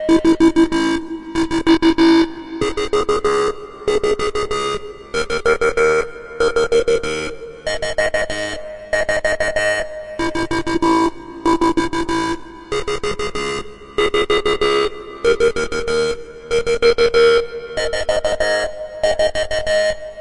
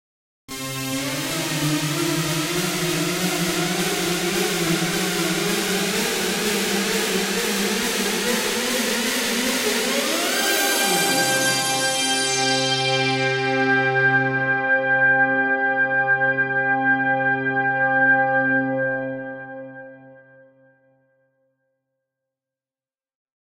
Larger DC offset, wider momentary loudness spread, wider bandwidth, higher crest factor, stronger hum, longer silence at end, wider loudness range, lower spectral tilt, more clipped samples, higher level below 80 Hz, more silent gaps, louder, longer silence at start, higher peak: neither; first, 11 LU vs 6 LU; second, 11.5 kHz vs 16 kHz; about the same, 14 dB vs 14 dB; neither; second, 0 s vs 3.25 s; about the same, 3 LU vs 4 LU; first, -4 dB/octave vs -2.5 dB/octave; neither; first, -38 dBFS vs -58 dBFS; neither; about the same, -18 LUFS vs -20 LUFS; second, 0 s vs 0.5 s; first, -2 dBFS vs -8 dBFS